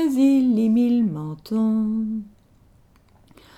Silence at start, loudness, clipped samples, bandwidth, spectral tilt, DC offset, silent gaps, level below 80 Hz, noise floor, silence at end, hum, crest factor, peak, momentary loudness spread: 0 s; -21 LUFS; under 0.1%; 13.5 kHz; -8 dB/octave; under 0.1%; none; -58 dBFS; -55 dBFS; 1.3 s; none; 12 dB; -8 dBFS; 11 LU